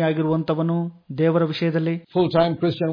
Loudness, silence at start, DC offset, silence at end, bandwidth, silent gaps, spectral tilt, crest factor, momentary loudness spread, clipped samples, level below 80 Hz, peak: -22 LUFS; 0 s; under 0.1%; 0 s; 5.2 kHz; none; -9.5 dB/octave; 16 dB; 5 LU; under 0.1%; -58 dBFS; -4 dBFS